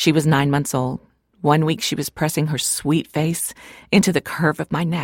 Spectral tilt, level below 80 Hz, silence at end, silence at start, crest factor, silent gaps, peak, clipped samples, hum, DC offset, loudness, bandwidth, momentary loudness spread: -5 dB/octave; -52 dBFS; 0 s; 0 s; 16 dB; none; -4 dBFS; under 0.1%; none; under 0.1%; -20 LUFS; 17 kHz; 8 LU